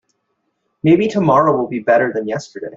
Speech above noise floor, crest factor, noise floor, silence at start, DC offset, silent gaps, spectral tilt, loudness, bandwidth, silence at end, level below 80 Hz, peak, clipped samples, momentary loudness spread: 55 dB; 14 dB; -69 dBFS; 0.85 s; under 0.1%; none; -7.5 dB/octave; -15 LUFS; 7.8 kHz; 0 s; -56 dBFS; -2 dBFS; under 0.1%; 10 LU